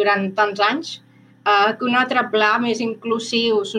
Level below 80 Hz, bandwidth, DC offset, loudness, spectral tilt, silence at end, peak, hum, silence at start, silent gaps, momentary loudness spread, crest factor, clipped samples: -78 dBFS; 10.5 kHz; under 0.1%; -19 LUFS; -4 dB/octave; 0 s; -4 dBFS; none; 0 s; none; 8 LU; 14 dB; under 0.1%